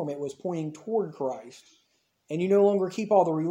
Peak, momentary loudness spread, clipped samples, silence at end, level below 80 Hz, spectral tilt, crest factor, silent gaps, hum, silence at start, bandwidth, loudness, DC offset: -8 dBFS; 12 LU; under 0.1%; 0 s; -78 dBFS; -7.5 dB/octave; 18 dB; none; none; 0 s; 9.8 kHz; -27 LUFS; under 0.1%